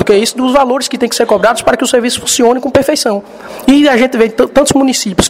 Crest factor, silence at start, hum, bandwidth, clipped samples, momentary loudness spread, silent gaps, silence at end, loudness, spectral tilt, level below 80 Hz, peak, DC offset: 10 dB; 0 s; none; 16.5 kHz; 0.4%; 5 LU; none; 0 s; -10 LUFS; -3.5 dB/octave; -38 dBFS; 0 dBFS; 0.2%